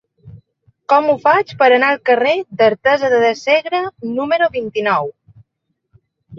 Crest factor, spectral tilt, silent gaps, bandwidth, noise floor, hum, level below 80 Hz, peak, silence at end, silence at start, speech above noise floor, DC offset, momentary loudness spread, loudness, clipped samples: 16 dB; -5 dB/octave; none; 7.4 kHz; -72 dBFS; none; -60 dBFS; 0 dBFS; 0 s; 0.25 s; 58 dB; under 0.1%; 8 LU; -15 LUFS; under 0.1%